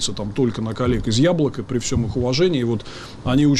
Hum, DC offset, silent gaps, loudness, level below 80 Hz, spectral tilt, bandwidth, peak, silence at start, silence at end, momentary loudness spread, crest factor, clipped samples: none; under 0.1%; none; -21 LUFS; -36 dBFS; -5.5 dB/octave; 12 kHz; -8 dBFS; 0 s; 0 s; 7 LU; 12 dB; under 0.1%